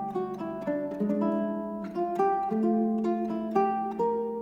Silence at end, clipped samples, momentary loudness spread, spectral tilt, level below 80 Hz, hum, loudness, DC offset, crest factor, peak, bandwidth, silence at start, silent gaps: 0 s; under 0.1%; 6 LU; -9 dB/octave; -66 dBFS; none; -29 LUFS; under 0.1%; 16 dB; -12 dBFS; 7.2 kHz; 0 s; none